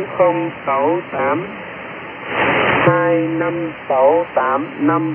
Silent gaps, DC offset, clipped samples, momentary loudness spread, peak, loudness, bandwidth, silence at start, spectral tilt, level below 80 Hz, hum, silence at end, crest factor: none; under 0.1%; under 0.1%; 15 LU; -2 dBFS; -17 LUFS; 3.4 kHz; 0 s; -10.5 dB/octave; -56 dBFS; none; 0 s; 16 dB